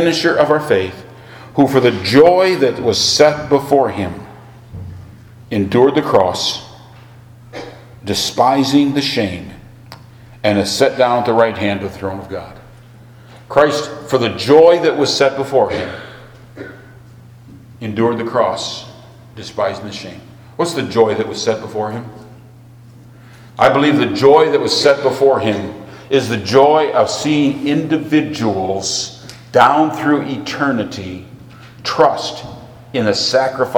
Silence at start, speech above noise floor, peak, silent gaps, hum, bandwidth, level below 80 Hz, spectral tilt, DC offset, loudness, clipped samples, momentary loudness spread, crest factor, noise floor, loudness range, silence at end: 0 s; 26 dB; 0 dBFS; none; none; 18.5 kHz; -50 dBFS; -4.5 dB/octave; under 0.1%; -14 LUFS; under 0.1%; 21 LU; 16 dB; -40 dBFS; 7 LU; 0 s